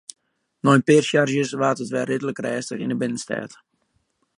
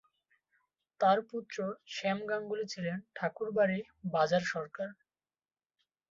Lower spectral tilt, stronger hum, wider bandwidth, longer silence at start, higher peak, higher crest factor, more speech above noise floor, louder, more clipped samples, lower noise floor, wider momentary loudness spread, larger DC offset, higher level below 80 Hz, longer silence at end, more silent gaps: about the same, -5.5 dB/octave vs -5.5 dB/octave; neither; first, 11 kHz vs 7.8 kHz; second, 0.65 s vs 1 s; first, -2 dBFS vs -14 dBFS; about the same, 22 dB vs 20 dB; second, 49 dB vs over 57 dB; first, -21 LUFS vs -34 LUFS; neither; second, -69 dBFS vs under -90 dBFS; first, 13 LU vs 10 LU; neither; first, -70 dBFS vs -78 dBFS; second, 0.9 s vs 1.2 s; neither